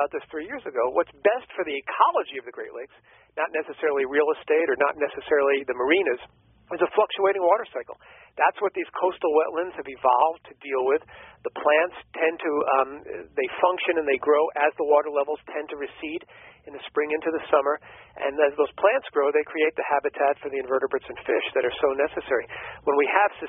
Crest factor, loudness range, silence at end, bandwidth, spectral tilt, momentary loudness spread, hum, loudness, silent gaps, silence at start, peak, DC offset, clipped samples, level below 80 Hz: 20 dB; 3 LU; 0 s; 3.8 kHz; 3 dB/octave; 13 LU; none; -24 LUFS; none; 0 s; -4 dBFS; under 0.1%; under 0.1%; -64 dBFS